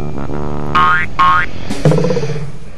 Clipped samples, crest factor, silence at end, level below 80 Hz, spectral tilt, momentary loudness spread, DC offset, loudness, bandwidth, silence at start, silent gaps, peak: 0.1%; 16 dB; 0 s; -32 dBFS; -6 dB/octave; 11 LU; 20%; -14 LUFS; 12 kHz; 0 s; none; 0 dBFS